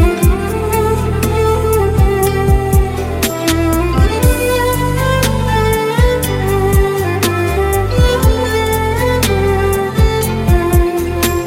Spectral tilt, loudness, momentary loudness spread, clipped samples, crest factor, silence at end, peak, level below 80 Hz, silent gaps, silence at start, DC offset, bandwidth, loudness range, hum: -5.5 dB/octave; -14 LUFS; 3 LU; under 0.1%; 12 dB; 0 s; 0 dBFS; -18 dBFS; none; 0 s; under 0.1%; 16.5 kHz; 0 LU; none